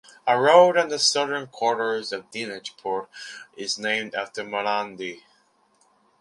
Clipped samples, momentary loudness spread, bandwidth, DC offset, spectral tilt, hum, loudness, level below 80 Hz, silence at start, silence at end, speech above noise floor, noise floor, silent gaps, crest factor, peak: under 0.1%; 17 LU; 11.5 kHz; under 0.1%; -2 dB/octave; none; -23 LUFS; -74 dBFS; 0.25 s; 1.05 s; 40 dB; -63 dBFS; none; 22 dB; -2 dBFS